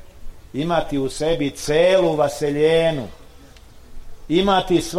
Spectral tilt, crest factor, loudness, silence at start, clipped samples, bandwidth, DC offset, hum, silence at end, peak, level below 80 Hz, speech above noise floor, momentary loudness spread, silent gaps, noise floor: -5 dB/octave; 14 dB; -19 LUFS; 0 s; under 0.1%; 15.5 kHz; 0.1%; none; 0 s; -6 dBFS; -38 dBFS; 25 dB; 10 LU; none; -43 dBFS